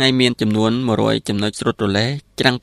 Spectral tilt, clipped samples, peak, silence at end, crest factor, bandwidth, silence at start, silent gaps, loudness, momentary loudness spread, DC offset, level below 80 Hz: -5 dB/octave; under 0.1%; 0 dBFS; 0.05 s; 18 dB; 14.5 kHz; 0 s; none; -18 LUFS; 4 LU; under 0.1%; -50 dBFS